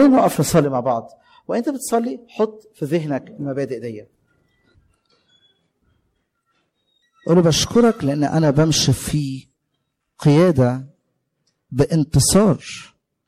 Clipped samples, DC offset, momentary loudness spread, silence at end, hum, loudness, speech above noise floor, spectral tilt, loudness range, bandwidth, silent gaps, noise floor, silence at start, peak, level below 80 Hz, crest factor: under 0.1%; under 0.1%; 15 LU; 0.4 s; none; -18 LUFS; 56 dB; -5.5 dB/octave; 11 LU; 16 kHz; none; -74 dBFS; 0 s; -4 dBFS; -44 dBFS; 16 dB